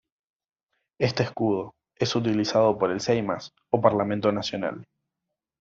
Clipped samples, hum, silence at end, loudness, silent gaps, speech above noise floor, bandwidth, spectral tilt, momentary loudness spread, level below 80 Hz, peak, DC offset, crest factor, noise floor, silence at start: under 0.1%; none; 0.75 s; -25 LUFS; none; 60 dB; 7.8 kHz; -5 dB/octave; 10 LU; -62 dBFS; -4 dBFS; under 0.1%; 22 dB; -85 dBFS; 1 s